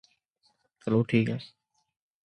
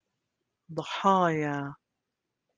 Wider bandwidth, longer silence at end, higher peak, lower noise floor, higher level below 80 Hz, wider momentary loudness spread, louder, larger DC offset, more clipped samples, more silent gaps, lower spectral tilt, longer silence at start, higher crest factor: about the same, 9.2 kHz vs 9.6 kHz; about the same, 0.8 s vs 0.8 s; about the same, -10 dBFS vs -10 dBFS; second, -72 dBFS vs -85 dBFS; first, -66 dBFS vs -74 dBFS; about the same, 16 LU vs 16 LU; about the same, -28 LUFS vs -28 LUFS; neither; neither; neither; first, -8.5 dB/octave vs -6 dB/octave; first, 0.85 s vs 0.7 s; about the same, 20 dB vs 22 dB